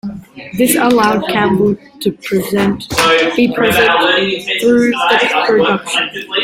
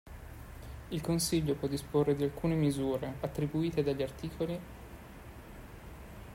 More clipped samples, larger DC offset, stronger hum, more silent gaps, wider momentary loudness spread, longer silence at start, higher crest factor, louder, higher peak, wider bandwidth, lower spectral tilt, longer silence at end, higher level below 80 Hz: neither; neither; neither; neither; second, 8 LU vs 19 LU; about the same, 0.05 s vs 0.05 s; about the same, 12 dB vs 16 dB; first, -12 LUFS vs -33 LUFS; first, 0 dBFS vs -18 dBFS; about the same, 16.5 kHz vs 16 kHz; second, -4 dB/octave vs -6 dB/octave; about the same, 0 s vs 0 s; first, -44 dBFS vs -52 dBFS